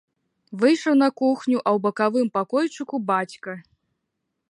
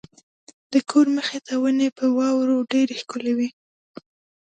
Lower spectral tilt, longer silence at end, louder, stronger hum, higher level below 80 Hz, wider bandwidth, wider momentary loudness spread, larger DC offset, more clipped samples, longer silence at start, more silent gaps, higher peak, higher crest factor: first, -5.5 dB/octave vs -4 dB/octave; about the same, 0.9 s vs 0.9 s; about the same, -22 LUFS vs -22 LUFS; neither; about the same, -76 dBFS vs -74 dBFS; first, 11 kHz vs 9.2 kHz; first, 16 LU vs 7 LU; neither; neither; second, 0.5 s vs 0.7 s; neither; about the same, -6 dBFS vs -6 dBFS; about the same, 18 dB vs 16 dB